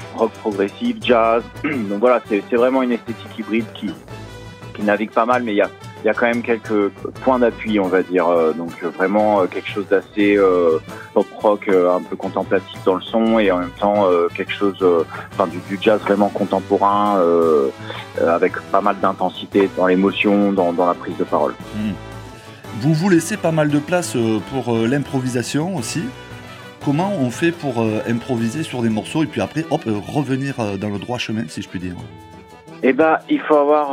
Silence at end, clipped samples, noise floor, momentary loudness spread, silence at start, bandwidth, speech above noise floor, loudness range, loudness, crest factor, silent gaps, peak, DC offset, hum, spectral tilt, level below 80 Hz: 0 s; under 0.1%; -39 dBFS; 11 LU; 0 s; 16 kHz; 21 dB; 4 LU; -18 LUFS; 16 dB; none; -2 dBFS; under 0.1%; none; -6 dB/octave; -50 dBFS